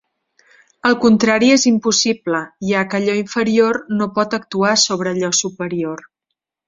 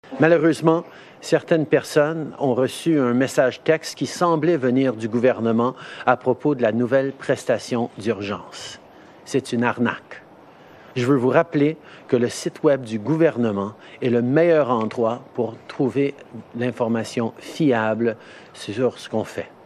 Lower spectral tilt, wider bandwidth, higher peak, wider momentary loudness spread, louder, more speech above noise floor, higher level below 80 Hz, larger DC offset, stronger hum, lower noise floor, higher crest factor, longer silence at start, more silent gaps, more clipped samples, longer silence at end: second, -3.5 dB/octave vs -6 dB/octave; second, 7.8 kHz vs 13.5 kHz; about the same, -2 dBFS vs -2 dBFS; second, 10 LU vs 13 LU; first, -16 LUFS vs -21 LUFS; first, 63 dB vs 26 dB; first, -58 dBFS vs -70 dBFS; neither; neither; first, -79 dBFS vs -46 dBFS; about the same, 16 dB vs 20 dB; first, 0.85 s vs 0.05 s; neither; neither; first, 0.65 s vs 0.15 s